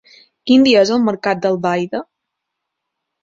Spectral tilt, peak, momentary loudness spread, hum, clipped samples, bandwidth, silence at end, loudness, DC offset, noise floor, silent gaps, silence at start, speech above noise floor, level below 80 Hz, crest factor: -5.5 dB/octave; -2 dBFS; 14 LU; none; under 0.1%; 7.8 kHz; 1.2 s; -15 LUFS; under 0.1%; -78 dBFS; none; 0.45 s; 64 dB; -58 dBFS; 16 dB